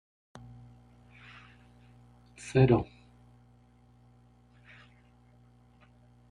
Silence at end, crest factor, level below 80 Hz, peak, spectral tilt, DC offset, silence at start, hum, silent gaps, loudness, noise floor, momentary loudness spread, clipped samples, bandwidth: 3.45 s; 26 dB; -56 dBFS; -10 dBFS; -8 dB/octave; under 0.1%; 2.45 s; 60 Hz at -50 dBFS; none; -27 LUFS; -61 dBFS; 31 LU; under 0.1%; 10.5 kHz